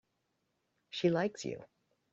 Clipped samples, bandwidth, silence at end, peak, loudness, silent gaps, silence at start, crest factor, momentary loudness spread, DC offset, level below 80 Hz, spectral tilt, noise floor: under 0.1%; 7.8 kHz; 0.45 s; -18 dBFS; -35 LUFS; none; 0.95 s; 20 dB; 13 LU; under 0.1%; -76 dBFS; -5 dB/octave; -81 dBFS